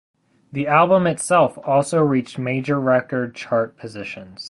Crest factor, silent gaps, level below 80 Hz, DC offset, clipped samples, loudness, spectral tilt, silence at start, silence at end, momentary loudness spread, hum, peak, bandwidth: 18 dB; none; -60 dBFS; under 0.1%; under 0.1%; -19 LUFS; -6 dB/octave; 0.55 s; 0 s; 15 LU; none; -2 dBFS; 11.5 kHz